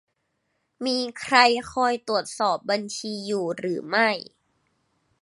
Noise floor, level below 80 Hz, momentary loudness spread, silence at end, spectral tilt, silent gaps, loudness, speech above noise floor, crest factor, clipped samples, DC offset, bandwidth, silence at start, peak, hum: -74 dBFS; -66 dBFS; 12 LU; 1 s; -3 dB/octave; none; -24 LUFS; 51 dB; 24 dB; under 0.1%; under 0.1%; 11.5 kHz; 0.8 s; -2 dBFS; none